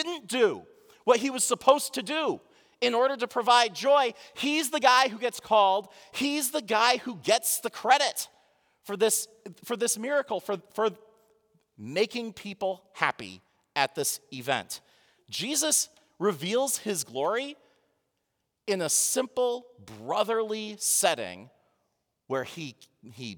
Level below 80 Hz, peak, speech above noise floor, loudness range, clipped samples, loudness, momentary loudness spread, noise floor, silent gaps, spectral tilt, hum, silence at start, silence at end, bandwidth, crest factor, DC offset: -80 dBFS; -4 dBFS; 53 dB; 7 LU; under 0.1%; -27 LUFS; 16 LU; -80 dBFS; none; -1.5 dB/octave; none; 0 s; 0 s; over 20 kHz; 24 dB; under 0.1%